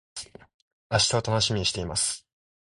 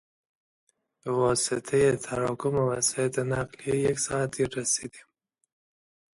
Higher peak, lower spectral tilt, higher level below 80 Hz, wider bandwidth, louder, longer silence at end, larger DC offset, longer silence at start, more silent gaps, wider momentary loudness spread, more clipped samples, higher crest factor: first, -8 dBFS vs -12 dBFS; about the same, -3 dB/octave vs -4 dB/octave; first, -48 dBFS vs -58 dBFS; about the same, 11.5 kHz vs 11.5 kHz; about the same, -25 LUFS vs -27 LUFS; second, 0.4 s vs 1.15 s; neither; second, 0.15 s vs 1.05 s; first, 0.54-0.90 s vs none; first, 17 LU vs 6 LU; neither; about the same, 20 dB vs 18 dB